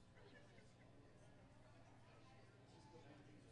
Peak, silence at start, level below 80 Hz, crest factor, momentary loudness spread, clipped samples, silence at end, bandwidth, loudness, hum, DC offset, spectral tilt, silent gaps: -52 dBFS; 0 s; -78 dBFS; 12 dB; 3 LU; under 0.1%; 0 s; 10 kHz; -67 LUFS; 60 Hz at -70 dBFS; under 0.1%; -5.5 dB/octave; none